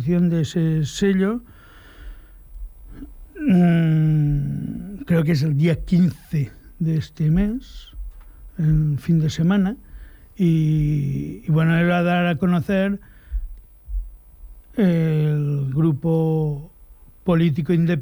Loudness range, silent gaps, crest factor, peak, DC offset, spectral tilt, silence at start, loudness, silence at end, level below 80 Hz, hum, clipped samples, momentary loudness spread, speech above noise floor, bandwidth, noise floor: 3 LU; none; 12 dB; -8 dBFS; under 0.1%; -8 dB/octave; 0 s; -20 LUFS; 0 s; -38 dBFS; none; under 0.1%; 19 LU; 28 dB; over 20 kHz; -46 dBFS